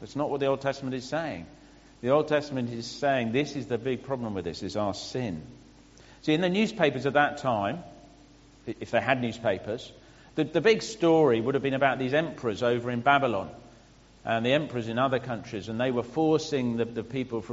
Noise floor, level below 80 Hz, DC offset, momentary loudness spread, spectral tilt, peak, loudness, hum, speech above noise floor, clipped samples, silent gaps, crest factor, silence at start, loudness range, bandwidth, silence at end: -55 dBFS; -60 dBFS; under 0.1%; 11 LU; -4.5 dB/octave; -8 dBFS; -28 LUFS; none; 28 dB; under 0.1%; none; 20 dB; 0 s; 5 LU; 8 kHz; 0 s